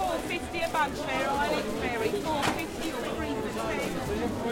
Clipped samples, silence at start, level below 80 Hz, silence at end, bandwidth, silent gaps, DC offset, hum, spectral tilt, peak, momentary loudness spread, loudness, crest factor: under 0.1%; 0 s; -48 dBFS; 0 s; 17 kHz; none; under 0.1%; none; -4.5 dB/octave; -12 dBFS; 4 LU; -30 LUFS; 18 dB